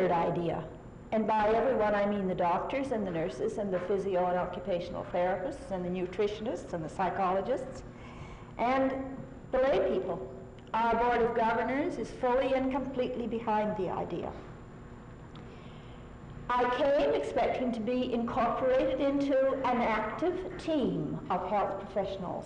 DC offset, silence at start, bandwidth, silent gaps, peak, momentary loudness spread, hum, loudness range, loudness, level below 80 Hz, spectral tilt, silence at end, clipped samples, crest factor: under 0.1%; 0 s; 10 kHz; none; -20 dBFS; 18 LU; none; 5 LU; -31 LUFS; -52 dBFS; -7 dB/octave; 0 s; under 0.1%; 10 dB